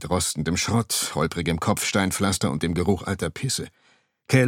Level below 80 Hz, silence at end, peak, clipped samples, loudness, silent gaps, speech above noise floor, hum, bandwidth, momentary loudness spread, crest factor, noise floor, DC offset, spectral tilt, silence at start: -46 dBFS; 0 s; -6 dBFS; under 0.1%; -24 LUFS; none; 21 dB; none; 17.5 kHz; 5 LU; 18 dB; -45 dBFS; under 0.1%; -4.5 dB/octave; 0 s